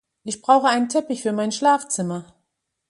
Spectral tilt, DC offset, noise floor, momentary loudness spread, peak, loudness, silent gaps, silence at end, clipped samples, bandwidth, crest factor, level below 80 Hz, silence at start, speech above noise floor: -4 dB/octave; under 0.1%; -76 dBFS; 12 LU; -2 dBFS; -20 LUFS; none; 0.65 s; under 0.1%; 11.5 kHz; 18 dB; -70 dBFS; 0.25 s; 55 dB